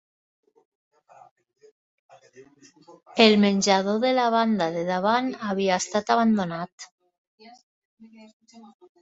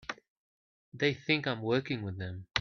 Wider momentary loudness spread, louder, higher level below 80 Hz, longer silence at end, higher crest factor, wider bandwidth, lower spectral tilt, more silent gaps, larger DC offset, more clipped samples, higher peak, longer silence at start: first, 16 LU vs 12 LU; first, -22 LUFS vs -32 LUFS; about the same, -68 dBFS vs -68 dBFS; first, 0.4 s vs 0 s; about the same, 22 dB vs 24 dB; first, 8 kHz vs 7.2 kHz; about the same, -4.5 dB/octave vs -5.5 dB/octave; first, 6.72-6.78 s, 6.91-6.98 s, 7.18-7.38 s, 7.63-7.97 s, 8.33-8.40 s vs 0.28-0.92 s; neither; neither; first, -2 dBFS vs -10 dBFS; first, 2.4 s vs 0.1 s